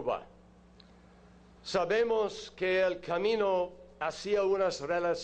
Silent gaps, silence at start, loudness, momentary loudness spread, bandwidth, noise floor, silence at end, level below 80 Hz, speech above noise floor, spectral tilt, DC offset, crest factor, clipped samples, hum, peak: none; 0 s; -31 LUFS; 9 LU; 9.2 kHz; -57 dBFS; 0 s; -62 dBFS; 27 dB; -4.5 dB/octave; under 0.1%; 14 dB; under 0.1%; none; -18 dBFS